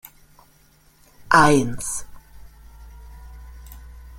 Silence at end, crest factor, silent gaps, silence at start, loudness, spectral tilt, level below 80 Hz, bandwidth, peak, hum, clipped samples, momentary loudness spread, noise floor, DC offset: 0 s; 22 dB; none; 1.3 s; -18 LUFS; -4.5 dB/octave; -42 dBFS; 17 kHz; -2 dBFS; none; under 0.1%; 29 LU; -56 dBFS; under 0.1%